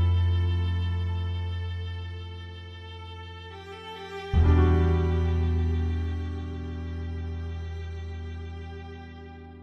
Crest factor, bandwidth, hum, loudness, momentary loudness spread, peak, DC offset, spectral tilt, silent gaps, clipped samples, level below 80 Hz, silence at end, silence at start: 18 dB; 6 kHz; none; -28 LUFS; 18 LU; -10 dBFS; under 0.1%; -8.5 dB/octave; none; under 0.1%; -34 dBFS; 0 s; 0 s